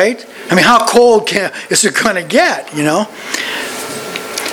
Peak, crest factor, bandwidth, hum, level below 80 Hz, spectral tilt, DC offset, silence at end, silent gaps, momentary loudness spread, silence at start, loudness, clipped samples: 0 dBFS; 14 dB; over 20 kHz; none; -52 dBFS; -3 dB/octave; under 0.1%; 0 s; none; 13 LU; 0 s; -12 LUFS; 0.2%